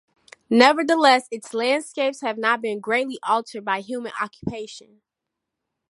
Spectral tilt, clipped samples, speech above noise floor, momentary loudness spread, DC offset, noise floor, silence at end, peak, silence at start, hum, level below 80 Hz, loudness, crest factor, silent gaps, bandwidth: -3.5 dB/octave; under 0.1%; 62 dB; 14 LU; under 0.1%; -83 dBFS; 1.1 s; 0 dBFS; 0.5 s; none; -62 dBFS; -21 LUFS; 22 dB; none; 11.5 kHz